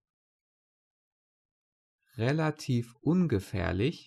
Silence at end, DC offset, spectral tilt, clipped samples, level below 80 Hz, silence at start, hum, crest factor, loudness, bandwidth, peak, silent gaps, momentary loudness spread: 0.05 s; under 0.1%; -7.5 dB/octave; under 0.1%; -56 dBFS; 2.15 s; none; 18 dB; -30 LUFS; 13 kHz; -14 dBFS; none; 5 LU